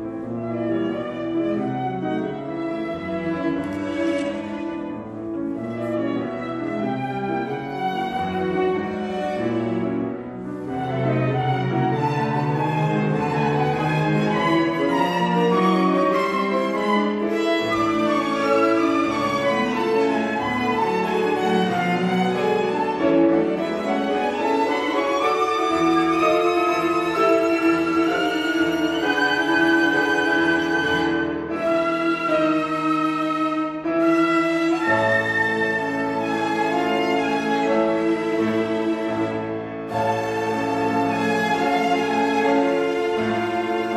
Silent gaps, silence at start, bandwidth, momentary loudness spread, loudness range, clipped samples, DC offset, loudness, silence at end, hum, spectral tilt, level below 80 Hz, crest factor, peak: none; 0 s; 13.5 kHz; 8 LU; 6 LU; under 0.1%; under 0.1%; -21 LUFS; 0 s; none; -6 dB/octave; -56 dBFS; 14 dB; -6 dBFS